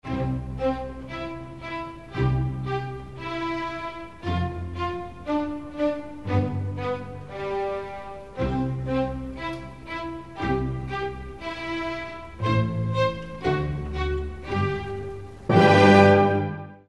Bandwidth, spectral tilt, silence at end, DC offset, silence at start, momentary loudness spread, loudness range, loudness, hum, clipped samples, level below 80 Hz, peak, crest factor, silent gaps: 11.5 kHz; -7.5 dB/octave; 0 s; 0.4%; 0 s; 15 LU; 9 LU; -26 LUFS; none; under 0.1%; -40 dBFS; 0 dBFS; 24 dB; none